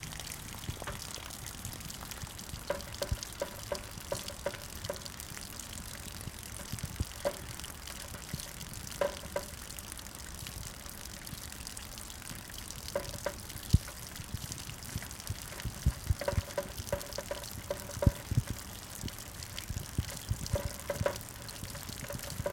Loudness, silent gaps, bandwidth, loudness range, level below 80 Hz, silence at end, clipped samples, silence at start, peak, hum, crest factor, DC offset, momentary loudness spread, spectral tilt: -39 LUFS; none; 17 kHz; 5 LU; -46 dBFS; 0 s; under 0.1%; 0 s; -10 dBFS; none; 28 dB; under 0.1%; 8 LU; -4 dB/octave